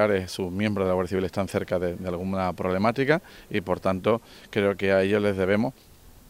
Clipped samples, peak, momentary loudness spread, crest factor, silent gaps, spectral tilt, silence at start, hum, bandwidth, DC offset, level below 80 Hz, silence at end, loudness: under 0.1%; -6 dBFS; 8 LU; 20 dB; none; -6.5 dB/octave; 0 s; none; 16 kHz; under 0.1%; -56 dBFS; 0.2 s; -26 LUFS